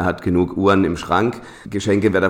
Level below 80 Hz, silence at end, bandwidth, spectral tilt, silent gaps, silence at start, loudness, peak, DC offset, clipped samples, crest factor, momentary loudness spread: -44 dBFS; 0 s; 14.5 kHz; -6.5 dB/octave; none; 0 s; -18 LUFS; -4 dBFS; under 0.1%; under 0.1%; 14 dB; 9 LU